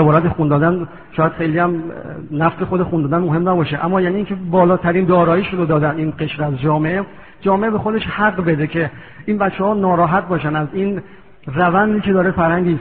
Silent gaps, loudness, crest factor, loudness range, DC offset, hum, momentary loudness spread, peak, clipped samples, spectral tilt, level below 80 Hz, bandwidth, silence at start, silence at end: none; -17 LUFS; 14 dB; 3 LU; 0.5%; none; 9 LU; -2 dBFS; under 0.1%; -6.5 dB/octave; -44 dBFS; 4.4 kHz; 0 s; 0 s